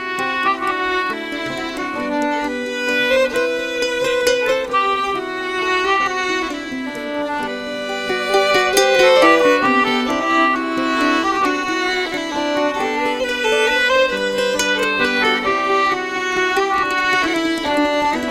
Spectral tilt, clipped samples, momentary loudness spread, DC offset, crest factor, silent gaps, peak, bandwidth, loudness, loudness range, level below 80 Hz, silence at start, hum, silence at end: -2.5 dB/octave; under 0.1%; 9 LU; under 0.1%; 16 dB; none; -2 dBFS; 16 kHz; -17 LUFS; 5 LU; -48 dBFS; 0 s; none; 0 s